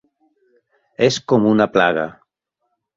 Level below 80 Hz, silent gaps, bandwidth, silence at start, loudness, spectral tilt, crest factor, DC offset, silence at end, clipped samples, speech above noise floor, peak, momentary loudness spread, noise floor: -58 dBFS; none; 7.8 kHz; 1 s; -17 LUFS; -5.5 dB/octave; 20 dB; under 0.1%; 0.85 s; under 0.1%; 58 dB; 0 dBFS; 8 LU; -74 dBFS